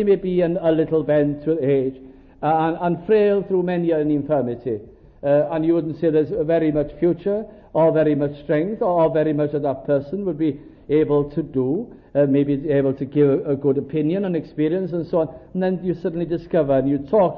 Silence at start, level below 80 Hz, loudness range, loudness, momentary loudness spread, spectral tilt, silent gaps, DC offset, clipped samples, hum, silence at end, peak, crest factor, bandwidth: 0 s; -50 dBFS; 2 LU; -21 LUFS; 7 LU; -11.5 dB/octave; none; under 0.1%; under 0.1%; none; 0 s; -6 dBFS; 14 dB; 5 kHz